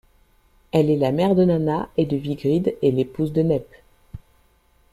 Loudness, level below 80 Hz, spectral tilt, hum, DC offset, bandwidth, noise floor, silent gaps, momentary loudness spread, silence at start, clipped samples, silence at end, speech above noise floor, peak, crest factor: -21 LUFS; -50 dBFS; -9 dB/octave; none; under 0.1%; 14.5 kHz; -59 dBFS; none; 6 LU; 0.75 s; under 0.1%; 0.75 s; 39 dB; -6 dBFS; 16 dB